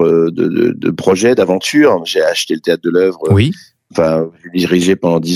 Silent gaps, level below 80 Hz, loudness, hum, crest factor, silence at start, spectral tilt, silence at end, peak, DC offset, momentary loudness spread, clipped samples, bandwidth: none; -48 dBFS; -13 LUFS; none; 12 dB; 0 s; -5.5 dB/octave; 0 s; 0 dBFS; under 0.1%; 6 LU; under 0.1%; 14.5 kHz